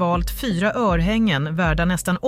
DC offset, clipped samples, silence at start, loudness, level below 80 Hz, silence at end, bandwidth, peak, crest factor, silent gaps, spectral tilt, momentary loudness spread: under 0.1%; under 0.1%; 0 s; -20 LUFS; -30 dBFS; 0 s; 16 kHz; -8 dBFS; 12 dB; none; -5.5 dB/octave; 3 LU